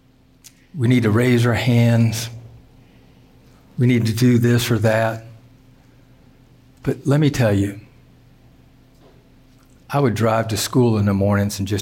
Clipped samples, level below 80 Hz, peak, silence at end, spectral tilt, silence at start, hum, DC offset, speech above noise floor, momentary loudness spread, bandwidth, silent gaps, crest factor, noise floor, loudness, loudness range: under 0.1%; -50 dBFS; -6 dBFS; 0 s; -6.5 dB/octave; 0.75 s; none; under 0.1%; 33 dB; 11 LU; 17 kHz; none; 14 dB; -50 dBFS; -18 LUFS; 4 LU